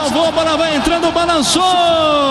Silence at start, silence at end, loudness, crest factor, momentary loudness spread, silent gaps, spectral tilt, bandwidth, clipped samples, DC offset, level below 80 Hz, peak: 0 s; 0 s; -13 LUFS; 12 dB; 3 LU; none; -3 dB/octave; 14 kHz; under 0.1%; under 0.1%; -38 dBFS; -2 dBFS